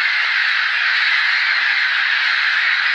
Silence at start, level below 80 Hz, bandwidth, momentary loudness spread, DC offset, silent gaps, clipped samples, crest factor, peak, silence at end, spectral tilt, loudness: 0 s; -78 dBFS; 9.2 kHz; 1 LU; under 0.1%; none; under 0.1%; 12 dB; -4 dBFS; 0 s; 4 dB/octave; -15 LUFS